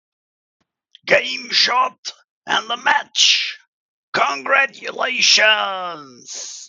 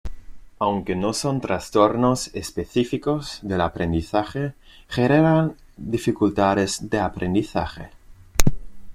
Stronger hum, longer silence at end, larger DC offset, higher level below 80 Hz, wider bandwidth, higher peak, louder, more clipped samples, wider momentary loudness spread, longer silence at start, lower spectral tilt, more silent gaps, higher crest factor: neither; about the same, 0 s vs 0 s; neither; second, -76 dBFS vs -36 dBFS; second, 14 kHz vs 16.5 kHz; about the same, 0 dBFS vs 0 dBFS; first, -16 LUFS vs -23 LUFS; neither; first, 18 LU vs 11 LU; first, 1.05 s vs 0.05 s; second, 0.5 dB/octave vs -5.5 dB/octave; first, 1.98-2.03 s, 2.29-2.41 s, 3.67-4.13 s vs none; about the same, 20 dB vs 22 dB